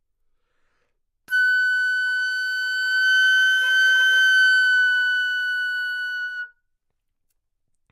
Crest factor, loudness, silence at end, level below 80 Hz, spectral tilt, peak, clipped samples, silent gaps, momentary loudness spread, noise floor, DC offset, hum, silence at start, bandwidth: 12 dB; -18 LUFS; 1.45 s; -76 dBFS; 5.5 dB/octave; -10 dBFS; under 0.1%; none; 11 LU; -74 dBFS; under 0.1%; none; 1.3 s; 15.5 kHz